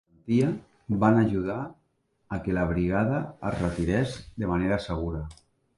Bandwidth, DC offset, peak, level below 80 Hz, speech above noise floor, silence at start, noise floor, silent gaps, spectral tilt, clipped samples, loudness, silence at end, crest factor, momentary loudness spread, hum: 11.5 kHz; under 0.1%; -8 dBFS; -44 dBFS; 45 dB; 0.25 s; -71 dBFS; none; -8 dB/octave; under 0.1%; -27 LUFS; 0.45 s; 18 dB; 13 LU; none